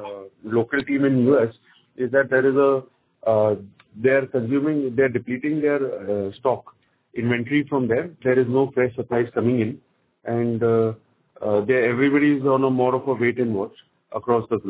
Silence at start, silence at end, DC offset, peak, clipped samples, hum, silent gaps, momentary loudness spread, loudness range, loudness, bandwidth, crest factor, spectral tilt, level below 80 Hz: 0 s; 0 s; under 0.1%; -6 dBFS; under 0.1%; none; none; 10 LU; 3 LU; -21 LUFS; 4 kHz; 16 dB; -11.5 dB/octave; -60 dBFS